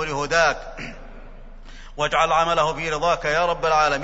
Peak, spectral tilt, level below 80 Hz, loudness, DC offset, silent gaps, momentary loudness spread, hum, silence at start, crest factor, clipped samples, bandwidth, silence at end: -4 dBFS; -3 dB/octave; -38 dBFS; -20 LUFS; under 0.1%; none; 16 LU; none; 0 s; 18 dB; under 0.1%; 8 kHz; 0 s